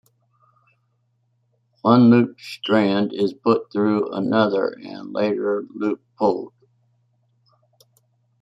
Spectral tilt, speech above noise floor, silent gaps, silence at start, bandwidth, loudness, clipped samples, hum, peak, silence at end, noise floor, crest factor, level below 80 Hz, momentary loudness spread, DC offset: -8 dB/octave; 48 dB; none; 1.85 s; 7.6 kHz; -20 LUFS; under 0.1%; none; -2 dBFS; 1.95 s; -68 dBFS; 20 dB; -68 dBFS; 13 LU; under 0.1%